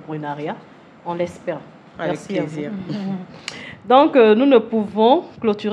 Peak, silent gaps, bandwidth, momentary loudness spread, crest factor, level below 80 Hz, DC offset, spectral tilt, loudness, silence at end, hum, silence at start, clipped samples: 0 dBFS; none; 10 kHz; 19 LU; 18 dB; -64 dBFS; under 0.1%; -6.5 dB/octave; -18 LUFS; 0 s; none; 0 s; under 0.1%